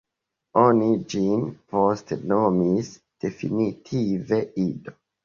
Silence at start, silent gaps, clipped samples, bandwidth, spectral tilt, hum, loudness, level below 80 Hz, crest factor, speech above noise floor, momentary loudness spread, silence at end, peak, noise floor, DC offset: 0.55 s; none; under 0.1%; 7.4 kHz; -7.5 dB/octave; none; -23 LUFS; -58 dBFS; 20 dB; 60 dB; 10 LU; 0.35 s; -4 dBFS; -83 dBFS; under 0.1%